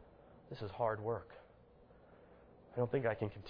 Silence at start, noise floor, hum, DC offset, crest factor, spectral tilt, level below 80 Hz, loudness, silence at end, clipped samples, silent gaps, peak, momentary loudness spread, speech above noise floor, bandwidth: 0 s; -63 dBFS; none; under 0.1%; 20 dB; -6.5 dB/octave; -68 dBFS; -40 LUFS; 0 s; under 0.1%; none; -22 dBFS; 25 LU; 25 dB; 5.4 kHz